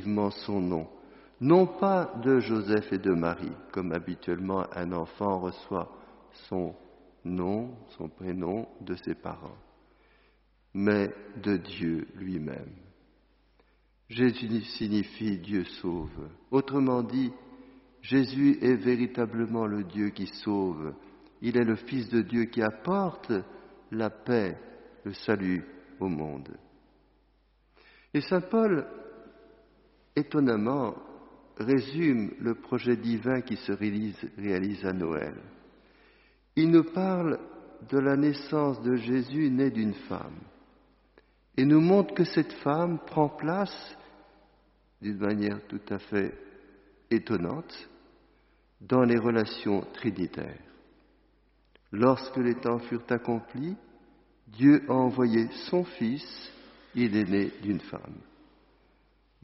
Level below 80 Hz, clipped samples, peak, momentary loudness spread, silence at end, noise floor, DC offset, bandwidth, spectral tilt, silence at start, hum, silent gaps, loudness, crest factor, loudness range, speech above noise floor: -62 dBFS; under 0.1%; -8 dBFS; 17 LU; 1.25 s; -66 dBFS; under 0.1%; 5.8 kHz; -6.5 dB/octave; 0 s; none; none; -29 LUFS; 22 dB; 7 LU; 38 dB